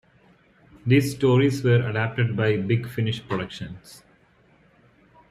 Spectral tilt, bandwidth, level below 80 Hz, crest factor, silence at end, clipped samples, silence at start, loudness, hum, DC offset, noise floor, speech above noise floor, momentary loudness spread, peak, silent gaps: -7 dB/octave; 15 kHz; -58 dBFS; 18 dB; 1.35 s; under 0.1%; 0.85 s; -23 LUFS; none; under 0.1%; -59 dBFS; 36 dB; 14 LU; -8 dBFS; none